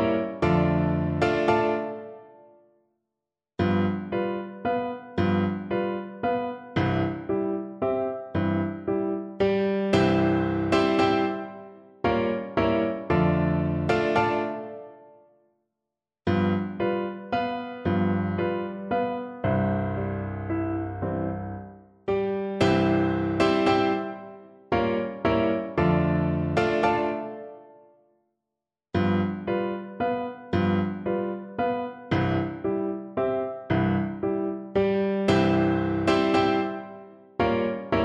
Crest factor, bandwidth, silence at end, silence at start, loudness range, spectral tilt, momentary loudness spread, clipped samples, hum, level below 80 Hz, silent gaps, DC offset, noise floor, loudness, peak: 18 dB; 9.6 kHz; 0 s; 0 s; 5 LU; -7.5 dB/octave; 9 LU; under 0.1%; none; -50 dBFS; none; under 0.1%; -87 dBFS; -26 LUFS; -8 dBFS